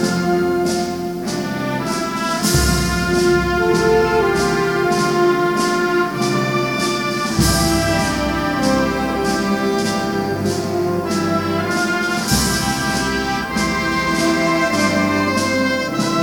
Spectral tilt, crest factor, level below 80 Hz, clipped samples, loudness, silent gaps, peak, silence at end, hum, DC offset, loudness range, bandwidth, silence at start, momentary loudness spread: -4.5 dB/octave; 16 dB; -34 dBFS; under 0.1%; -17 LUFS; none; -2 dBFS; 0 s; none; under 0.1%; 3 LU; 19 kHz; 0 s; 5 LU